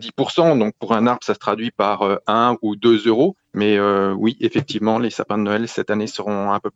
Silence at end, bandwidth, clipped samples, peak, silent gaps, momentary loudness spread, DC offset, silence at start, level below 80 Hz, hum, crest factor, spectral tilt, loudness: 0.05 s; 8 kHz; under 0.1%; -4 dBFS; none; 6 LU; under 0.1%; 0 s; -64 dBFS; none; 16 dB; -6 dB/octave; -19 LUFS